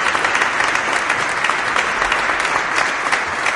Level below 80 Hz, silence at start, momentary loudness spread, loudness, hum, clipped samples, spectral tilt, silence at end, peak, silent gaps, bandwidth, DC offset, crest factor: -48 dBFS; 0 s; 2 LU; -17 LUFS; none; under 0.1%; -1 dB/octave; 0 s; 0 dBFS; none; 11.5 kHz; under 0.1%; 18 dB